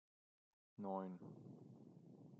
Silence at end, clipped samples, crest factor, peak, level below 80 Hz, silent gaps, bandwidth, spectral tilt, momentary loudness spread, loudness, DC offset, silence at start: 0 s; under 0.1%; 22 dB; -32 dBFS; under -90 dBFS; none; 7.2 kHz; -9.5 dB/octave; 16 LU; -52 LUFS; under 0.1%; 0.8 s